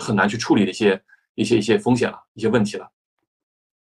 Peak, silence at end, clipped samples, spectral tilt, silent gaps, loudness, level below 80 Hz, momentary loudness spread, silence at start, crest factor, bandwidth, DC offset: -4 dBFS; 0.95 s; under 0.1%; -5.5 dB/octave; 1.29-1.35 s, 2.28-2.35 s; -20 LUFS; -56 dBFS; 9 LU; 0 s; 16 dB; 11.5 kHz; under 0.1%